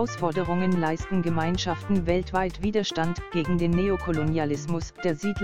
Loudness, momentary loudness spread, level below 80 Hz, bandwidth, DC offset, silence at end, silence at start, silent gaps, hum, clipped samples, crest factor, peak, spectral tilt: -26 LUFS; 4 LU; -42 dBFS; 10.5 kHz; 1%; 0 s; 0 s; none; none; under 0.1%; 16 dB; -10 dBFS; -6.5 dB/octave